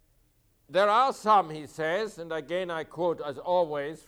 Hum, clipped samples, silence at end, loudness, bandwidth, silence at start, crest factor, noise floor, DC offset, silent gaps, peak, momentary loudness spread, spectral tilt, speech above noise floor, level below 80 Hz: none; under 0.1%; 0.1 s; -28 LUFS; 15 kHz; 0.7 s; 16 dB; -67 dBFS; under 0.1%; none; -12 dBFS; 11 LU; -4.5 dB/octave; 39 dB; -66 dBFS